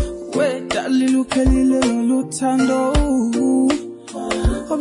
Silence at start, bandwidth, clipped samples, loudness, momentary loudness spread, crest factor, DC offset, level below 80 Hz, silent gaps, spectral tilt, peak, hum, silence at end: 0 s; 11 kHz; under 0.1%; -18 LUFS; 7 LU; 12 dB; under 0.1%; -28 dBFS; none; -5.5 dB/octave; -6 dBFS; none; 0 s